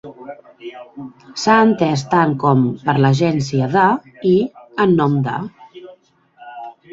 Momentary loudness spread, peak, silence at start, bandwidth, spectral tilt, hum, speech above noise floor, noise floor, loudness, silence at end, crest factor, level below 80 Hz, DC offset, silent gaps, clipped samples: 21 LU; -2 dBFS; 0.05 s; 7.8 kHz; -7 dB/octave; none; 34 dB; -50 dBFS; -16 LUFS; 0.2 s; 16 dB; -56 dBFS; under 0.1%; none; under 0.1%